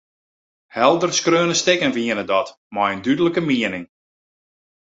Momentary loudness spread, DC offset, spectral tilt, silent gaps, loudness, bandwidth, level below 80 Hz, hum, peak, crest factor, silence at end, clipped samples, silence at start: 8 LU; under 0.1%; -3.5 dB/octave; 2.57-2.70 s; -19 LUFS; 8 kHz; -60 dBFS; none; -2 dBFS; 20 dB; 1.05 s; under 0.1%; 0.75 s